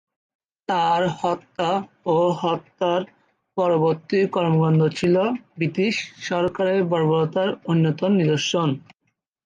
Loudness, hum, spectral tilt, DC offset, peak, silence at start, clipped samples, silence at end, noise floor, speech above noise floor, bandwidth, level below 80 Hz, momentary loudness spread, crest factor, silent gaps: -22 LUFS; none; -6.5 dB/octave; under 0.1%; -8 dBFS; 0.7 s; under 0.1%; 0.65 s; -74 dBFS; 53 dB; 9 kHz; -62 dBFS; 7 LU; 14 dB; none